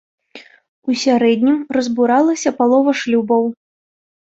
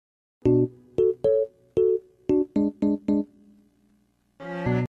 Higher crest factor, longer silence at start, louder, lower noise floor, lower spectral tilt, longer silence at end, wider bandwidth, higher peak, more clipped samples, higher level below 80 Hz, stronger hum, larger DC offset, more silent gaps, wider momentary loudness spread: about the same, 14 dB vs 16 dB; about the same, 0.35 s vs 0.45 s; first, -16 LUFS vs -25 LUFS; second, -42 dBFS vs -65 dBFS; second, -4.5 dB/octave vs -10 dB/octave; first, 0.8 s vs 0 s; first, 8 kHz vs 7 kHz; first, -2 dBFS vs -10 dBFS; neither; second, -62 dBFS vs -52 dBFS; second, none vs 60 Hz at -60 dBFS; neither; first, 0.69-0.82 s vs none; about the same, 6 LU vs 8 LU